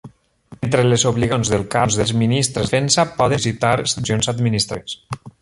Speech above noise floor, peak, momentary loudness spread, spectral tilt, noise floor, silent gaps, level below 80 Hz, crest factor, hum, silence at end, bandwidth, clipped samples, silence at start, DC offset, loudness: 27 dB; -2 dBFS; 9 LU; -4.5 dB/octave; -45 dBFS; none; -42 dBFS; 16 dB; none; 0.15 s; 11.5 kHz; under 0.1%; 0.05 s; under 0.1%; -18 LUFS